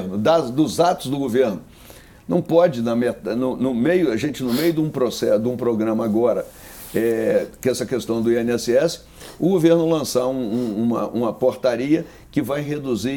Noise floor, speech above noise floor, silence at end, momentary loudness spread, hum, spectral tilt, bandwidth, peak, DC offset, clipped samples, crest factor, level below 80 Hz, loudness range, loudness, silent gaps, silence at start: -44 dBFS; 25 dB; 0 s; 7 LU; none; -6 dB/octave; 19 kHz; -4 dBFS; under 0.1%; under 0.1%; 16 dB; -52 dBFS; 1 LU; -20 LUFS; none; 0 s